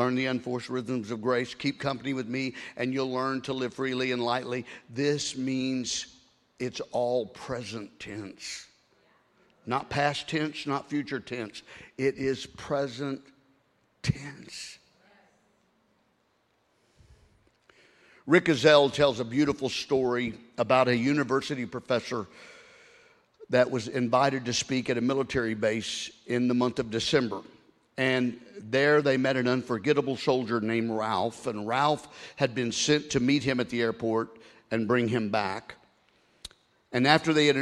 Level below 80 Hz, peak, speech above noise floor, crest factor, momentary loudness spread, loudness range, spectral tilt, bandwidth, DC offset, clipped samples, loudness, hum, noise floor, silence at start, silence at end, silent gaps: -62 dBFS; -4 dBFS; 43 dB; 24 dB; 16 LU; 9 LU; -4.5 dB/octave; 12 kHz; under 0.1%; under 0.1%; -28 LUFS; none; -71 dBFS; 0 s; 0 s; none